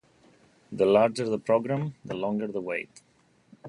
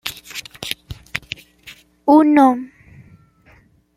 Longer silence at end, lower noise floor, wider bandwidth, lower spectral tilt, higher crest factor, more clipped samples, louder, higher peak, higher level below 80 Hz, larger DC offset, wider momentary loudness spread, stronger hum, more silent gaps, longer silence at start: second, 0 s vs 1.3 s; first, -60 dBFS vs -52 dBFS; second, 11 kHz vs 15.5 kHz; first, -6.5 dB/octave vs -4.5 dB/octave; about the same, 20 dB vs 20 dB; neither; second, -27 LUFS vs -17 LUFS; second, -8 dBFS vs 0 dBFS; second, -68 dBFS vs -52 dBFS; neither; second, 13 LU vs 20 LU; neither; neither; first, 0.7 s vs 0.05 s